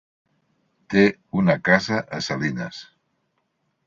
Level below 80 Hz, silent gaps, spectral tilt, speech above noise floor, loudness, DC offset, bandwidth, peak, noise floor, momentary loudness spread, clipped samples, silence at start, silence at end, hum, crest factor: -58 dBFS; none; -6 dB/octave; 51 dB; -21 LUFS; under 0.1%; 7.6 kHz; -2 dBFS; -72 dBFS; 13 LU; under 0.1%; 0.9 s; 1.05 s; none; 22 dB